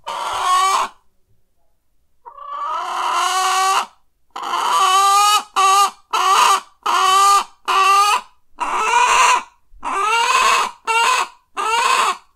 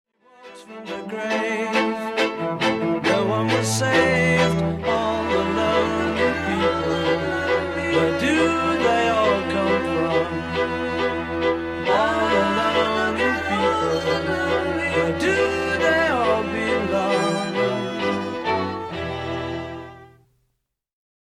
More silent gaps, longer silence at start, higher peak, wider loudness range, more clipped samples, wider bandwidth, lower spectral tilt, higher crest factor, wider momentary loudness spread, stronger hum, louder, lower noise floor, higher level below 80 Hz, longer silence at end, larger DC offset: neither; second, 0.05 s vs 0.4 s; first, 0 dBFS vs -6 dBFS; first, 7 LU vs 4 LU; neither; first, 16 kHz vs 14.5 kHz; second, 2 dB/octave vs -5 dB/octave; about the same, 16 dB vs 16 dB; first, 12 LU vs 7 LU; neither; first, -15 LUFS vs -21 LUFS; second, -58 dBFS vs -74 dBFS; second, -56 dBFS vs -46 dBFS; second, 0.15 s vs 1.3 s; neither